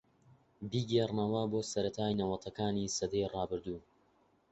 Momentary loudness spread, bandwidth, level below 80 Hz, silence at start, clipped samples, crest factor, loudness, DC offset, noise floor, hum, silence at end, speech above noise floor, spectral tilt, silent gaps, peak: 8 LU; 8 kHz; -62 dBFS; 0.6 s; under 0.1%; 18 dB; -35 LUFS; under 0.1%; -71 dBFS; none; 0.7 s; 36 dB; -6 dB/octave; none; -18 dBFS